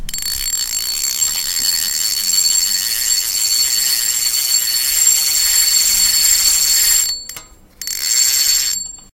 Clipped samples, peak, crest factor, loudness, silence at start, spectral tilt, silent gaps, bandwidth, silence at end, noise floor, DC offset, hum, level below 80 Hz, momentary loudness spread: under 0.1%; -2 dBFS; 14 dB; -12 LUFS; 0 s; 3.5 dB/octave; none; 17.5 kHz; 0.1 s; -37 dBFS; under 0.1%; none; -40 dBFS; 8 LU